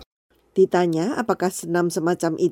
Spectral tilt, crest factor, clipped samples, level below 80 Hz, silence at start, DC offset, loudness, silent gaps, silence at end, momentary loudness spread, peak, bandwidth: -6 dB/octave; 16 dB; under 0.1%; -64 dBFS; 0 s; under 0.1%; -22 LUFS; 0.06-0.29 s; 0 s; 5 LU; -6 dBFS; 16.5 kHz